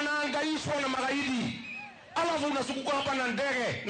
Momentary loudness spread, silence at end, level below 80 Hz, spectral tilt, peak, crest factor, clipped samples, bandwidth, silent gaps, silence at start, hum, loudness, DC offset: 7 LU; 0 s; -66 dBFS; -3.5 dB/octave; -20 dBFS; 10 dB; under 0.1%; 9.4 kHz; none; 0 s; none; -31 LUFS; under 0.1%